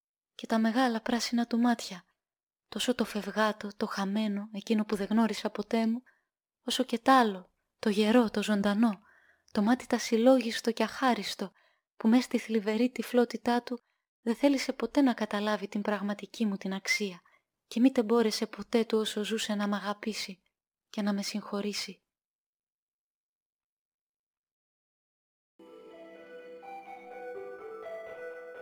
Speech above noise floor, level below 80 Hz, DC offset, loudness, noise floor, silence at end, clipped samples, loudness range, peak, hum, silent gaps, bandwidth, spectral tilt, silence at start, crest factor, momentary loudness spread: over 61 dB; -72 dBFS; under 0.1%; -30 LUFS; under -90 dBFS; 0 s; under 0.1%; 11 LU; -10 dBFS; none; 2.43-2.47 s, 14.08-14.23 s, 22.25-24.44 s, 24.51-25.59 s; over 20 kHz; -4.5 dB/octave; 0.4 s; 20 dB; 18 LU